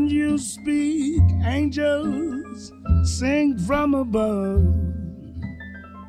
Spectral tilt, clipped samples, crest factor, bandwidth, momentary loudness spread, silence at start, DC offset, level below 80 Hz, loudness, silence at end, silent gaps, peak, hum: -6.5 dB/octave; under 0.1%; 14 dB; 11.5 kHz; 15 LU; 0 s; under 0.1%; -30 dBFS; -22 LUFS; 0 s; none; -6 dBFS; none